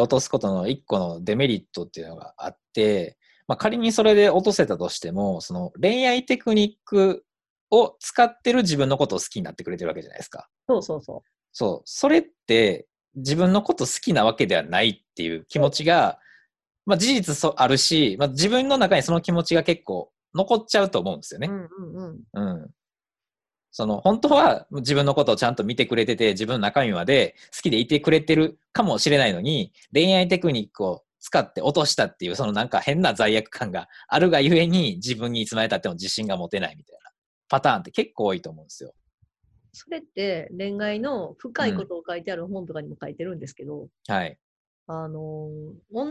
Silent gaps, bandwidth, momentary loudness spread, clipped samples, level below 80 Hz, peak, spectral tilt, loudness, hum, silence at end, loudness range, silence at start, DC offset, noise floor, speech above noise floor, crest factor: 7.50-7.67 s, 37.18-37.42 s, 39.14-39.18 s, 44.42-44.86 s; 12.5 kHz; 17 LU; under 0.1%; -58 dBFS; -4 dBFS; -4.5 dB/octave; -22 LUFS; none; 0 s; 9 LU; 0 s; under 0.1%; under -90 dBFS; over 68 dB; 18 dB